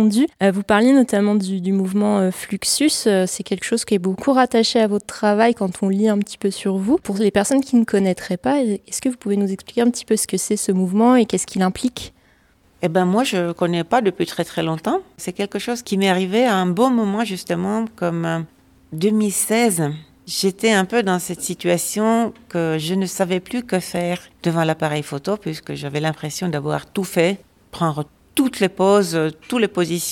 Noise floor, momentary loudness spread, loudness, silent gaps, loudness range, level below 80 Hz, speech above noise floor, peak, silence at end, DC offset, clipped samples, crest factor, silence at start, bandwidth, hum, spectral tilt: -56 dBFS; 8 LU; -19 LUFS; none; 4 LU; -56 dBFS; 37 dB; -2 dBFS; 0 s; under 0.1%; under 0.1%; 16 dB; 0 s; 17 kHz; none; -5 dB/octave